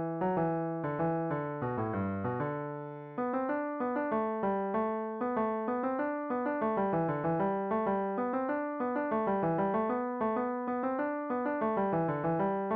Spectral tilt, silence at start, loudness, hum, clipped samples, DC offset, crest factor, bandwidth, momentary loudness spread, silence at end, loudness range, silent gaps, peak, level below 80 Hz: -8 dB/octave; 0 s; -33 LUFS; none; under 0.1%; under 0.1%; 12 dB; 4.6 kHz; 4 LU; 0 s; 3 LU; none; -20 dBFS; -66 dBFS